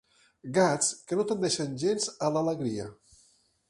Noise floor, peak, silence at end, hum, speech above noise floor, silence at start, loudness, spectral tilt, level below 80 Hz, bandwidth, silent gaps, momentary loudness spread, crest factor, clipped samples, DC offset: -65 dBFS; -10 dBFS; 0.75 s; none; 37 dB; 0.45 s; -28 LUFS; -4 dB/octave; -68 dBFS; 11.5 kHz; none; 10 LU; 20 dB; under 0.1%; under 0.1%